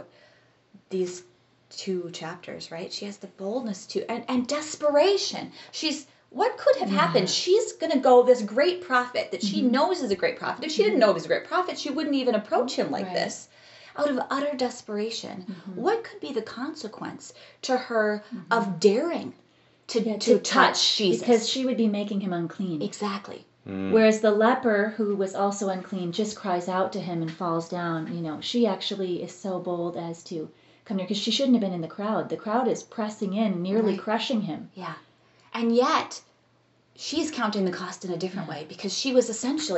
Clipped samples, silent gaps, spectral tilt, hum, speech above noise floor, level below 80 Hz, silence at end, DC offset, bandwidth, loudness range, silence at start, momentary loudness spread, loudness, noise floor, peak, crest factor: under 0.1%; none; -4.5 dB/octave; none; 38 dB; -76 dBFS; 0 s; under 0.1%; 8.2 kHz; 7 LU; 0 s; 15 LU; -26 LUFS; -64 dBFS; -4 dBFS; 22 dB